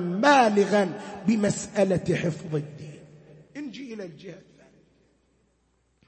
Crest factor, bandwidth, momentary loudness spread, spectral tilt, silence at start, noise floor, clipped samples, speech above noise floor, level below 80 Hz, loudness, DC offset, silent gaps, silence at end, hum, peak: 20 dB; 8.8 kHz; 24 LU; -5.5 dB/octave; 0 s; -69 dBFS; under 0.1%; 45 dB; -62 dBFS; -24 LUFS; under 0.1%; none; 1.65 s; none; -6 dBFS